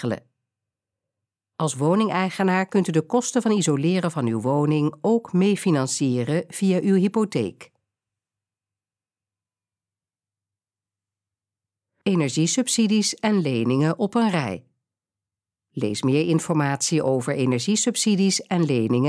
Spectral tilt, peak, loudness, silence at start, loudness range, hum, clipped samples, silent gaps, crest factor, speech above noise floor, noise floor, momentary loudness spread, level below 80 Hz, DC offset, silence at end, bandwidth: -5 dB/octave; -6 dBFS; -22 LUFS; 0 s; 5 LU; none; under 0.1%; none; 16 dB; over 69 dB; under -90 dBFS; 6 LU; -72 dBFS; under 0.1%; 0 s; 11 kHz